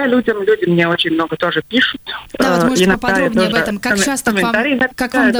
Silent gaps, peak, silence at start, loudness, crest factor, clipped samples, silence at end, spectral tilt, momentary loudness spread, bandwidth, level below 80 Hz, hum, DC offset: none; -2 dBFS; 0 s; -15 LUFS; 12 dB; under 0.1%; 0 s; -4 dB/octave; 4 LU; over 20 kHz; -42 dBFS; none; under 0.1%